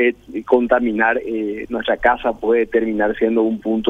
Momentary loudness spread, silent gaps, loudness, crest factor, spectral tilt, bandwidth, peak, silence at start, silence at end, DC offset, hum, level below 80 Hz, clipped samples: 8 LU; none; -18 LUFS; 16 dB; -7 dB/octave; 6.4 kHz; 0 dBFS; 0 s; 0 s; under 0.1%; none; -44 dBFS; under 0.1%